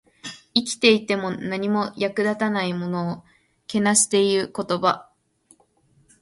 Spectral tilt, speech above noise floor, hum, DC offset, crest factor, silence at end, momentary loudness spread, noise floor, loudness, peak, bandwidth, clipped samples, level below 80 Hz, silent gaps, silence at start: -3.5 dB/octave; 39 dB; none; under 0.1%; 22 dB; 1.2 s; 11 LU; -61 dBFS; -22 LUFS; -2 dBFS; 11.5 kHz; under 0.1%; -64 dBFS; none; 0.25 s